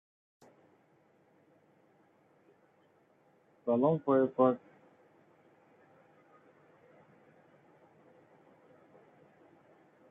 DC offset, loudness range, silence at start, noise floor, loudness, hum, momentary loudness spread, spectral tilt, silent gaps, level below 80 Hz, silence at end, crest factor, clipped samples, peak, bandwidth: under 0.1%; 5 LU; 3.65 s; -68 dBFS; -30 LUFS; none; 12 LU; -8.5 dB/octave; none; -84 dBFS; 5.55 s; 24 dB; under 0.1%; -16 dBFS; 3.8 kHz